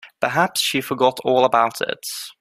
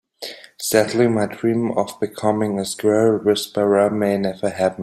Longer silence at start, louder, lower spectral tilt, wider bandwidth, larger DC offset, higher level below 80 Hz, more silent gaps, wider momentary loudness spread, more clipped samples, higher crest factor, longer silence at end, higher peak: second, 0.05 s vs 0.2 s; about the same, -19 LUFS vs -19 LUFS; second, -3 dB/octave vs -5 dB/octave; about the same, 16 kHz vs 16 kHz; neither; about the same, -64 dBFS vs -60 dBFS; neither; about the same, 9 LU vs 8 LU; neither; about the same, 20 dB vs 18 dB; about the same, 0.1 s vs 0 s; about the same, 0 dBFS vs -2 dBFS